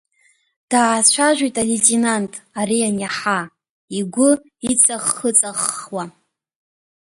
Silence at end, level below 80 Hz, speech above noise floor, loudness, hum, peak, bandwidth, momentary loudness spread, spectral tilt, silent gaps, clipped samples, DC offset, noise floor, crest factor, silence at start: 0.95 s; -60 dBFS; 42 dB; -17 LUFS; none; 0 dBFS; 12 kHz; 14 LU; -2.5 dB/octave; 3.69-3.88 s; under 0.1%; under 0.1%; -60 dBFS; 20 dB; 0.7 s